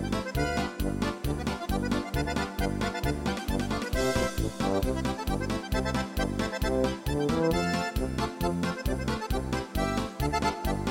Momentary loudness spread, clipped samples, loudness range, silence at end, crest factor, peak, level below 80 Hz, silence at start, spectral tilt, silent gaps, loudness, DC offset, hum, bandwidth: 4 LU; under 0.1%; 1 LU; 0 s; 14 dB; -14 dBFS; -36 dBFS; 0 s; -5.5 dB/octave; none; -30 LUFS; under 0.1%; none; 17 kHz